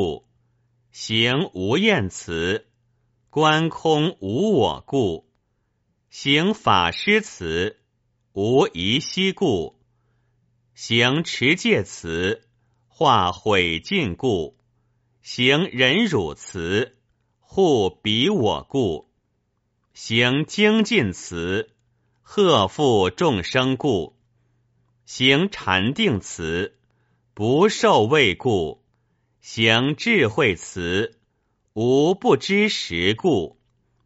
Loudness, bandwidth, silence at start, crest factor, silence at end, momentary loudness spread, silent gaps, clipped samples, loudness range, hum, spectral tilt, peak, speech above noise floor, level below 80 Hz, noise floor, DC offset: -20 LUFS; 8 kHz; 0 s; 20 dB; 0.55 s; 11 LU; none; under 0.1%; 3 LU; none; -3 dB/octave; -2 dBFS; 51 dB; -52 dBFS; -71 dBFS; under 0.1%